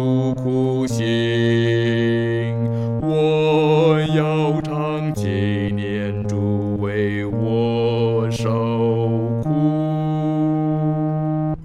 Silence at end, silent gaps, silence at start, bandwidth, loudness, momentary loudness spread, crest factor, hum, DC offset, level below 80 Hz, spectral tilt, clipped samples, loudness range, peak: 0 s; none; 0 s; 11.5 kHz; -20 LUFS; 6 LU; 14 dB; none; under 0.1%; -46 dBFS; -7.5 dB/octave; under 0.1%; 3 LU; -6 dBFS